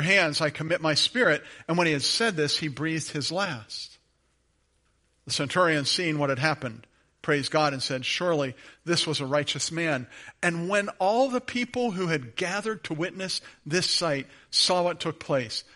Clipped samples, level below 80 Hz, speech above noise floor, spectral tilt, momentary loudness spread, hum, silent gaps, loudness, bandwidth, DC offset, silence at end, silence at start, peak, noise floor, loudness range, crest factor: under 0.1%; -66 dBFS; 43 dB; -3.5 dB/octave; 10 LU; none; none; -26 LUFS; 11.5 kHz; under 0.1%; 0.15 s; 0 s; -8 dBFS; -69 dBFS; 3 LU; 20 dB